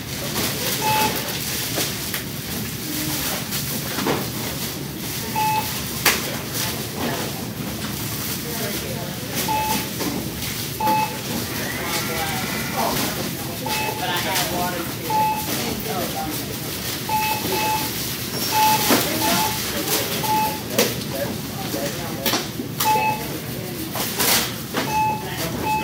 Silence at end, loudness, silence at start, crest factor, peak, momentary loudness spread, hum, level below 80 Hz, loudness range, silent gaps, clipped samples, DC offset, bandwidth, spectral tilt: 0 s; -22 LUFS; 0 s; 22 dB; 0 dBFS; 8 LU; none; -46 dBFS; 5 LU; none; under 0.1%; under 0.1%; 16 kHz; -3 dB/octave